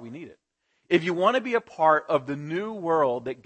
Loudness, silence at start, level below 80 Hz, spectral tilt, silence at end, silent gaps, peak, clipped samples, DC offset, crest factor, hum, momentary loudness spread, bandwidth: -24 LUFS; 0 s; -74 dBFS; -6.5 dB/octave; 0.1 s; none; -6 dBFS; under 0.1%; under 0.1%; 20 dB; none; 9 LU; 8.6 kHz